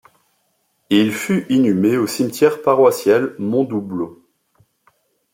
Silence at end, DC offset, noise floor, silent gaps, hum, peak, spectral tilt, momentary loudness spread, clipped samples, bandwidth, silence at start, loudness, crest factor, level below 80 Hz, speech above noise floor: 1.2 s; under 0.1%; -66 dBFS; none; none; -2 dBFS; -5.5 dB/octave; 9 LU; under 0.1%; 16.5 kHz; 0.9 s; -17 LUFS; 16 dB; -64 dBFS; 50 dB